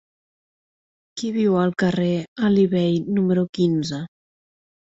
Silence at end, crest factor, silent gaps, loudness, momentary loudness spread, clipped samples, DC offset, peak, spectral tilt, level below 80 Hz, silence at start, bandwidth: 0.8 s; 14 dB; 2.28-2.36 s, 3.49-3.53 s; -21 LUFS; 11 LU; under 0.1%; under 0.1%; -8 dBFS; -7 dB/octave; -60 dBFS; 1.15 s; 7.8 kHz